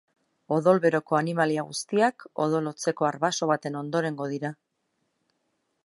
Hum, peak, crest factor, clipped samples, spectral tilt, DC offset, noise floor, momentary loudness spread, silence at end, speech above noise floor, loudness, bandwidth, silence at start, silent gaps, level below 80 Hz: none; -6 dBFS; 20 dB; under 0.1%; -5 dB/octave; under 0.1%; -76 dBFS; 8 LU; 1.3 s; 51 dB; -26 LUFS; 11.5 kHz; 0.5 s; none; -76 dBFS